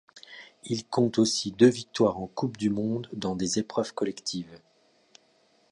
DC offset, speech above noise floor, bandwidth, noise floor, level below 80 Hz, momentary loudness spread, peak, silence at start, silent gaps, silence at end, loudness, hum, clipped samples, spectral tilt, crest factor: under 0.1%; 38 dB; 11.5 kHz; -65 dBFS; -62 dBFS; 19 LU; -6 dBFS; 0.15 s; none; 1.15 s; -27 LUFS; none; under 0.1%; -5 dB/octave; 22 dB